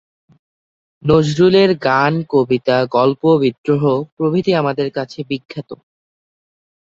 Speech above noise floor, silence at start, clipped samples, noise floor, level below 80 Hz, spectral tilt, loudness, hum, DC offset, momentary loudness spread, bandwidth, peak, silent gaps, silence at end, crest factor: over 75 dB; 1.05 s; under 0.1%; under -90 dBFS; -52 dBFS; -7 dB/octave; -15 LUFS; none; under 0.1%; 13 LU; 7.8 kHz; 0 dBFS; 3.58-3.64 s, 4.12-4.17 s, 5.45-5.49 s; 1.1 s; 16 dB